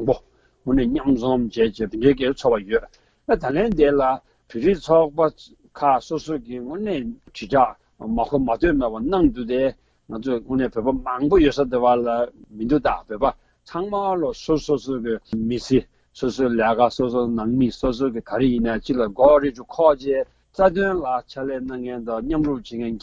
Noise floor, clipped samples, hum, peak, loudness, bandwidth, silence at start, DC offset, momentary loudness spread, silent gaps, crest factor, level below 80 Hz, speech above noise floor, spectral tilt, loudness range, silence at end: -50 dBFS; under 0.1%; none; -2 dBFS; -21 LUFS; 7.8 kHz; 0 s; under 0.1%; 11 LU; none; 18 dB; -40 dBFS; 29 dB; -7 dB/octave; 4 LU; 0.05 s